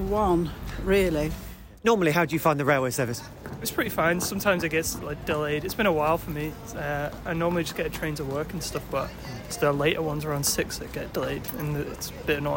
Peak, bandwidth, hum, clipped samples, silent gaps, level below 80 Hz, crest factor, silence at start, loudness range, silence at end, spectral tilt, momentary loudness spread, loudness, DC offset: -8 dBFS; 17 kHz; none; under 0.1%; none; -42 dBFS; 18 dB; 0 s; 4 LU; 0 s; -4.5 dB/octave; 10 LU; -27 LUFS; under 0.1%